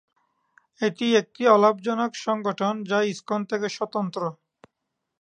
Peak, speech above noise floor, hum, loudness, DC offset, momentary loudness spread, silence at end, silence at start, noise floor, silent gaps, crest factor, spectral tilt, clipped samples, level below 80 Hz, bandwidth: -4 dBFS; 57 dB; none; -24 LUFS; under 0.1%; 10 LU; 0.9 s; 0.8 s; -81 dBFS; none; 22 dB; -5 dB/octave; under 0.1%; -78 dBFS; 9.6 kHz